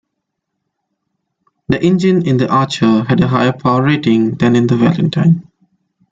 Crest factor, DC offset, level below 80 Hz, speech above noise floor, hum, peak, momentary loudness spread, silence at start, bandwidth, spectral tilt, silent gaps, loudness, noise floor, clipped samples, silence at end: 12 dB; under 0.1%; -48 dBFS; 62 dB; none; -2 dBFS; 2 LU; 1.7 s; 7.8 kHz; -7.5 dB/octave; none; -13 LUFS; -74 dBFS; under 0.1%; 0.7 s